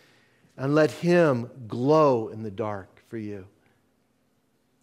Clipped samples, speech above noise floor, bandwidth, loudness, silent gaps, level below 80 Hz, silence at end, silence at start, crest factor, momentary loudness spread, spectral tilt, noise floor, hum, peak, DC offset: under 0.1%; 45 dB; 13.5 kHz; -24 LUFS; none; -72 dBFS; 1.35 s; 0.6 s; 18 dB; 18 LU; -7.5 dB/octave; -69 dBFS; none; -8 dBFS; under 0.1%